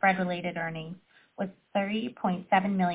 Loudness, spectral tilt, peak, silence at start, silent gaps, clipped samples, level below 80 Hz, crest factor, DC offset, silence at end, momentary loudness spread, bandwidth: -30 LUFS; -10 dB/octave; -12 dBFS; 0.05 s; none; under 0.1%; -72 dBFS; 18 dB; under 0.1%; 0 s; 13 LU; 4 kHz